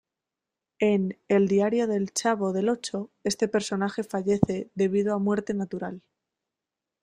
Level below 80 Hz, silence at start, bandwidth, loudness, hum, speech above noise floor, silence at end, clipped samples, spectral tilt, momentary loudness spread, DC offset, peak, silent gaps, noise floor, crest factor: -60 dBFS; 0.8 s; 13.5 kHz; -26 LUFS; none; 62 dB; 1.05 s; under 0.1%; -5.5 dB/octave; 8 LU; under 0.1%; -4 dBFS; none; -88 dBFS; 22 dB